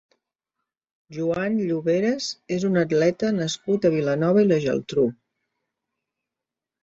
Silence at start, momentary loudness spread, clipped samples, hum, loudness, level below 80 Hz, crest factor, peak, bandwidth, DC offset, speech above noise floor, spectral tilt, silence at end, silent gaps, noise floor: 1.1 s; 7 LU; under 0.1%; none; -23 LUFS; -62 dBFS; 16 dB; -8 dBFS; 8 kHz; under 0.1%; 65 dB; -6 dB/octave; 1.7 s; none; -87 dBFS